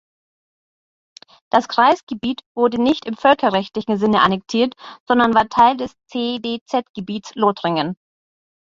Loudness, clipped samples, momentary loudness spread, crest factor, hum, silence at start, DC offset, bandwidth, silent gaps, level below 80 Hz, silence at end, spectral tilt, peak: -18 LUFS; under 0.1%; 12 LU; 20 dB; none; 1.55 s; under 0.1%; 7.6 kHz; 2.03-2.07 s, 2.46-2.55 s, 5.00-5.06 s, 6.61-6.66 s, 6.89-6.94 s; -56 dBFS; 0.7 s; -5.5 dB/octave; 0 dBFS